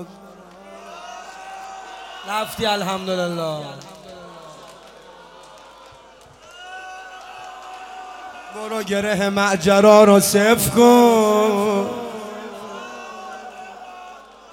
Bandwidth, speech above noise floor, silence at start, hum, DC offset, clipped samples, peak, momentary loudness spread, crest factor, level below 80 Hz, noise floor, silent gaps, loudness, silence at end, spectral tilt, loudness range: 17 kHz; 30 dB; 0 s; none; under 0.1%; under 0.1%; 0 dBFS; 26 LU; 20 dB; -56 dBFS; -46 dBFS; none; -16 LUFS; 0.35 s; -4.5 dB/octave; 23 LU